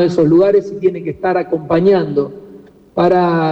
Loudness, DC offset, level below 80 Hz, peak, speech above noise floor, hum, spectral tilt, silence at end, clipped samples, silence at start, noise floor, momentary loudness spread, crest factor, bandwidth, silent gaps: -14 LUFS; under 0.1%; -50 dBFS; -4 dBFS; 27 dB; none; -8.5 dB/octave; 0 s; under 0.1%; 0 s; -40 dBFS; 9 LU; 10 dB; 7.8 kHz; none